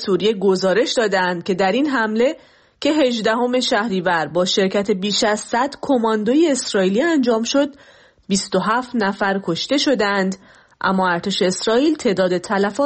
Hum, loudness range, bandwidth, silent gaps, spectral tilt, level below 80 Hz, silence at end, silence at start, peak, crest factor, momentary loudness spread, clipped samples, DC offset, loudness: none; 2 LU; 8.8 kHz; none; -4 dB/octave; -58 dBFS; 0 s; 0 s; -6 dBFS; 12 dB; 4 LU; under 0.1%; under 0.1%; -18 LUFS